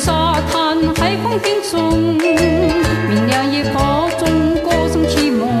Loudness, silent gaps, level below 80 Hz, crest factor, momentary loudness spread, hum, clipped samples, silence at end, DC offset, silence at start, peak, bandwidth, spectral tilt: -15 LUFS; none; -30 dBFS; 12 dB; 2 LU; none; under 0.1%; 0 s; under 0.1%; 0 s; -2 dBFS; 14 kHz; -5.5 dB/octave